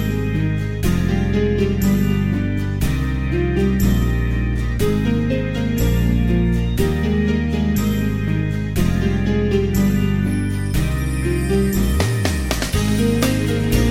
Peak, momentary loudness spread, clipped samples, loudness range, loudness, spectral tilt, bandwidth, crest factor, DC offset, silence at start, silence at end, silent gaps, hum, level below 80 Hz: -4 dBFS; 4 LU; under 0.1%; 1 LU; -19 LUFS; -6.5 dB/octave; 16.5 kHz; 14 dB; 0.3%; 0 s; 0 s; none; none; -24 dBFS